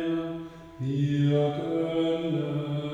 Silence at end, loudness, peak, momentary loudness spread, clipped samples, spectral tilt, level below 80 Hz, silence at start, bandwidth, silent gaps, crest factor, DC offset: 0 s; -28 LUFS; -14 dBFS; 12 LU; under 0.1%; -8.5 dB/octave; -60 dBFS; 0 s; 7.8 kHz; none; 14 dB; under 0.1%